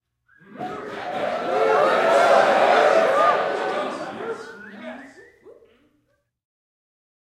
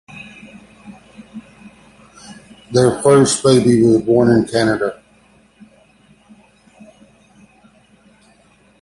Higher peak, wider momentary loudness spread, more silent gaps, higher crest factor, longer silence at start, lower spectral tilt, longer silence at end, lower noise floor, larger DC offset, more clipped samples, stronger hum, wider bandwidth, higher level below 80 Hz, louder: second, -4 dBFS vs 0 dBFS; second, 21 LU vs 26 LU; neither; about the same, 18 dB vs 18 dB; first, 0.5 s vs 0.15 s; second, -3.5 dB/octave vs -5.5 dB/octave; second, 1.85 s vs 3.9 s; first, -69 dBFS vs -52 dBFS; neither; neither; neither; first, 14 kHz vs 11.5 kHz; second, -68 dBFS vs -50 dBFS; second, -19 LUFS vs -14 LUFS